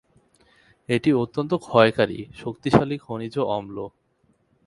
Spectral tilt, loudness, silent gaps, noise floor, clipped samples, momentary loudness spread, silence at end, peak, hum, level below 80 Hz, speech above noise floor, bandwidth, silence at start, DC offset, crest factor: -7 dB/octave; -23 LUFS; none; -65 dBFS; under 0.1%; 16 LU; 0.8 s; 0 dBFS; none; -54 dBFS; 43 dB; 11.5 kHz; 0.9 s; under 0.1%; 24 dB